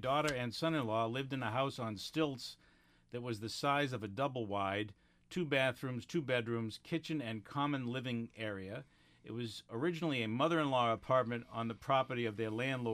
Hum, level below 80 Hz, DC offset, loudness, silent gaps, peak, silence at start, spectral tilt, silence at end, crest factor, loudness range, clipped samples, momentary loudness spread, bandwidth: none; -70 dBFS; under 0.1%; -37 LUFS; none; -18 dBFS; 0 s; -5.5 dB/octave; 0 s; 18 dB; 4 LU; under 0.1%; 10 LU; 15.5 kHz